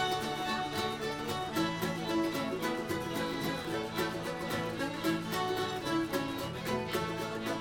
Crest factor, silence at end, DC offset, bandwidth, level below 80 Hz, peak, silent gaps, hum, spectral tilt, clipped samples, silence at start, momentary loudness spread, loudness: 16 dB; 0 s; under 0.1%; 18 kHz; -60 dBFS; -18 dBFS; none; none; -4.5 dB/octave; under 0.1%; 0 s; 3 LU; -34 LUFS